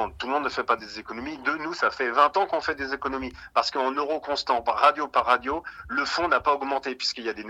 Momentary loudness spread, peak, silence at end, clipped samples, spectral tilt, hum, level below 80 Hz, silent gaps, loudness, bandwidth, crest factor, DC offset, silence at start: 9 LU; -4 dBFS; 0 s; under 0.1%; -3 dB/octave; none; -54 dBFS; none; -25 LUFS; 11.5 kHz; 22 dB; under 0.1%; 0 s